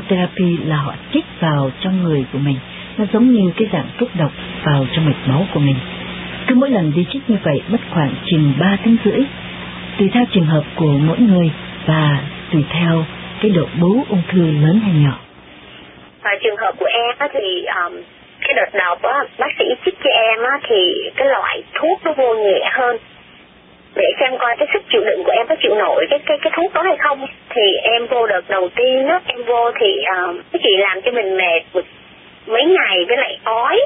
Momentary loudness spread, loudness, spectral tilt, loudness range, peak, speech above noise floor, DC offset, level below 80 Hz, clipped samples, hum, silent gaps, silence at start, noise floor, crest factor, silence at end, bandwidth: 8 LU; -16 LUFS; -11.5 dB/octave; 2 LU; 0 dBFS; 30 dB; under 0.1%; -48 dBFS; under 0.1%; none; none; 0 s; -45 dBFS; 16 dB; 0 s; 4 kHz